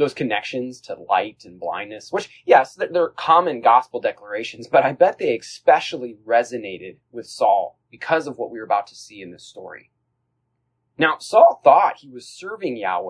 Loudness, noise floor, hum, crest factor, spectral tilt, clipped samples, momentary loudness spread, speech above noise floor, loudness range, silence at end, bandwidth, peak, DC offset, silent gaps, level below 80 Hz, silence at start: -19 LUFS; -73 dBFS; none; 20 dB; -4.5 dB/octave; under 0.1%; 22 LU; 53 dB; 6 LU; 0 s; 10.5 kHz; 0 dBFS; under 0.1%; none; -70 dBFS; 0 s